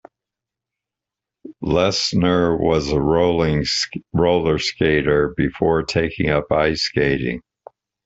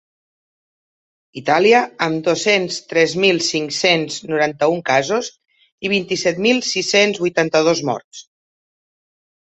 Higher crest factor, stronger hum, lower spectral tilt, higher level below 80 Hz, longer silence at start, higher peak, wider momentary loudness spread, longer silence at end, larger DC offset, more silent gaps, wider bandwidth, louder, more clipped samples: about the same, 16 dB vs 18 dB; neither; first, -5.5 dB/octave vs -3.5 dB/octave; first, -40 dBFS vs -64 dBFS; about the same, 1.45 s vs 1.35 s; about the same, -4 dBFS vs -2 dBFS; second, 4 LU vs 8 LU; second, 0.65 s vs 1.35 s; neither; second, none vs 5.72-5.78 s, 8.04-8.11 s; about the same, 8 kHz vs 8.2 kHz; about the same, -19 LUFS vs -17 LUFS; neither